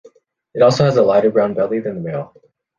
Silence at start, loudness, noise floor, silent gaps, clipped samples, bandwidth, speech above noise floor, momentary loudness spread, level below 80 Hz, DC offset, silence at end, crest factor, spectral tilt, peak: 0.55 s; -16 LUFS; -49 dBFS; none; under 0.1%; 7.6 kHz; 34 dB; 15 LU; -56 dBFS; under 0.1%; 0.5 s; 14 dB; -6.5 dB/octave; -2 dBFS